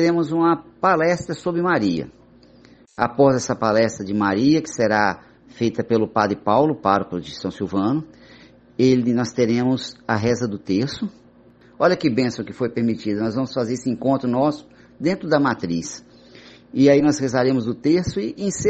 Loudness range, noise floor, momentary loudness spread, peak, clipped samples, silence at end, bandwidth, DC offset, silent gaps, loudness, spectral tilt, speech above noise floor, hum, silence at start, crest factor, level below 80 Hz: 3 LU; -50 dBFS; 10 LU; -2 dBFS; under 0.1%; 0 s; 8.4 kHz; under 0.1%; none; -20 LUFS; -6 dB/octave; 30 dB; none; 0 s; 18 dB; -54 dBFS